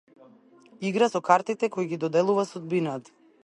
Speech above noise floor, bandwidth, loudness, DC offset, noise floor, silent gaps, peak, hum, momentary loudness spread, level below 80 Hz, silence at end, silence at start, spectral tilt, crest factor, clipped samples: 30 dB; 11.5 kHz; -26 LUFS; under 0.1%; -55 dBFS; none; -4 dBFS; none; 9 LU; -76 dBFS; 0.45 s; 0.8 s; -6 dB/octave; 22 dB; under 0.1%